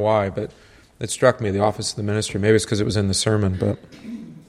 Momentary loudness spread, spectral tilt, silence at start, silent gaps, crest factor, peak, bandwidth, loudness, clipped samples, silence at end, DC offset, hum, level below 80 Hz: 15 LU; -5 dB/octave; 0 s; none; 20 dB; -2 dBFS; 14 kHz; -21 LUFS; under 0.1%; 0.1 s; under 0.1%; none; -48 dBFS